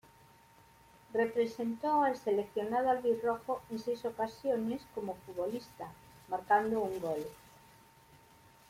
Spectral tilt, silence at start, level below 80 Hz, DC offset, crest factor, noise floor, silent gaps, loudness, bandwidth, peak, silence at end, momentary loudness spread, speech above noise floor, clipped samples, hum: -6 dB/octave; 1.1 s; -70 dBFS; under 0.1%; 20 dB; -62 dBFS; none; -34 LUFS; 16.5 kHz; -16 dBFS; 1.35 s; 11 LU; 28 dB; under 0.1%; none